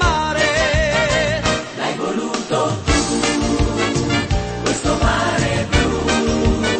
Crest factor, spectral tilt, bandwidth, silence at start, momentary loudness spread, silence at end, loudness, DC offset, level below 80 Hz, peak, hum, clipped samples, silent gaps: 16 dB; -4.5 dB/octave; 8.8 kHz; 0 s; 5 LU; 0 s; -18 LUFS; under 0.1%; -26 dBFS; -2 dBFS; none; under 0.1%; none